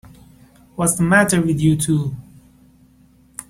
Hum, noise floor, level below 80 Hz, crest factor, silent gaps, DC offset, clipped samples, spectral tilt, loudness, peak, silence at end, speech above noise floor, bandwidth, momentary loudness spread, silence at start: none; -52 dBFS; -48 dBFS; 18 dB; none; under 0.1%; under 0.1%; -5 dB/octave; -17 LUFS; -2 dBFS; 0.1 s; 36 dB; 16 kHz; 22 LU; 0.8 s